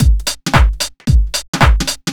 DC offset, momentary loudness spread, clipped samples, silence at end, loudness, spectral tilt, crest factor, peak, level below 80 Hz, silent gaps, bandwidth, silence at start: under 0.1%; 5 LU; 0.1%; 0 s; -15 LUFS; -4 dB/octave; 12 dB; 0 dBFS; -14 dBFS; 1.48-1.53 s; 17.5 kHz; 0 s